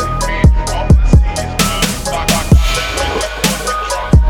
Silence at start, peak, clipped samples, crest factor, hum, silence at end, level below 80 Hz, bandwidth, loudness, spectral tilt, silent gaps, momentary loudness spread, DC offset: 0 s; 0 dBFS; under 0.1%; 12 dB; none; 0 s; -14 dBFS; 18.5 kHz; -13 LUFS; -4.5 dB/octave; none; 6 LU; under 0.1%